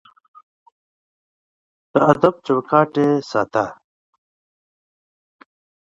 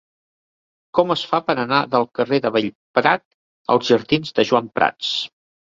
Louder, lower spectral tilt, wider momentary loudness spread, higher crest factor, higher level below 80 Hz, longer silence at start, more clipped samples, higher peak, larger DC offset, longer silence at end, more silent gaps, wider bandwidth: about the same, -18 LUFS vs -19 LUFS; first, -7.5 dB/octave vs -5 dB/octave; about the same, 7 LU vs 5 LU; about the same, 22 dB vs 18 dB; about the same, -62 dBFS vs -60 dBFS; first, 1.95 s vs 0.95 s; neither; about the same, 0 dBFS vs -2 dBFS; neither; first, 2.2 s vs 0.35 s; second, none vs 2.75-2.94 s, 3.25-3.65 s; about the same, 7.8 kHz vs 7.8 kHz